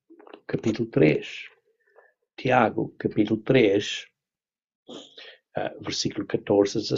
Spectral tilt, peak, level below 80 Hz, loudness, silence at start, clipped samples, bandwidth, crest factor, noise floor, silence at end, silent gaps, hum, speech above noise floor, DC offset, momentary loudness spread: -5.5 dB/octave; -6 dBFS; -60 dBFS; -24 LUFS; 0.5 s; under 0.1%; 7.8 kHz; 20 dB; under -90 dBFS; 0 s; 4.75-4.86 s; none; over 66 dB; under 0.1%; 23 LU